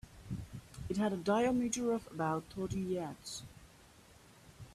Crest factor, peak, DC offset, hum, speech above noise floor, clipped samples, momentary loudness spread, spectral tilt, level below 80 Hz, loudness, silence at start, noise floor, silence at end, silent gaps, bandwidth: 18 dB; -20 dBFS; under 0.1%; none; 25 dB; under 0.1%; 16 LU; -5.5 dB/octave; -60 dBFS; -37 LUFS; 0.05 s; -61 dBFS; 0 s; none; 14 kHz